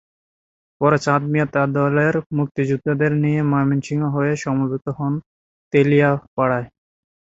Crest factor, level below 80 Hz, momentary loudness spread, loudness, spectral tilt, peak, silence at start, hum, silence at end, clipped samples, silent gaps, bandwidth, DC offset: 18 dB; -54 dBFS; 8 LU; -19 LUFS; -8 dB/octave; -2 dBFS; 0.8 s; none; 0.6 s; under 0.1%; 2.26-2.30 s, 2.51-2.55 s, 5.26-5.71 s, 6.27-6.37 s; 7.8 kHz; under 0.1%